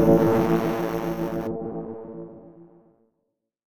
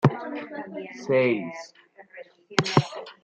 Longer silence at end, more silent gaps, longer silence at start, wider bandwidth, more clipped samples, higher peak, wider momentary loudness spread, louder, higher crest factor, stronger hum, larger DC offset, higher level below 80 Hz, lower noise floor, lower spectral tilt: first, 1 s vs 0.1 s; neither; about the same, 0 s vs 0 s; first, 19.5 kHz vs 9 kHz; neither; about the same, -4 dBFS vs -2 dBFS; second, 20 LU vs 23 LU; about the same, -24 LUFS vs -26 LUFS; about the same, 20 dB vs 24 dB; neither; neither; first, -50 dBFS vs -64 dBFS; first, -78 dBFS vs -47 dBFS; first, -8 dB/octave vs -6 dB/octave